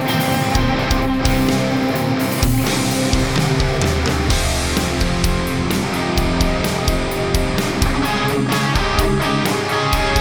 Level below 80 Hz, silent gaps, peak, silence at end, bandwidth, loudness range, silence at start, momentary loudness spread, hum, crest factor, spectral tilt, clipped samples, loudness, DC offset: -24 dBFS; none; -2 dBFS; 0 s; over 20 kHz; 1 LU; 0 s; 2 LU; none; 16 dB; -4.5 dB/octave; under 0.1%; -18 LUFS; under 0.1%